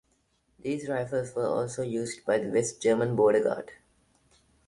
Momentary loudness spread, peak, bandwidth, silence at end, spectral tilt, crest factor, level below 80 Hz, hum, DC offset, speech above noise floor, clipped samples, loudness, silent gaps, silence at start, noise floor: 11 LU; -12 dBFS; 11.5 kHz; 0.95 s; -5.5 dB/octave; 18 dB; -66 dBFS; none; under 0.1%; 43 dB; under 0.1%; -28 LUFS; none; 0.65 s; -71 dBFS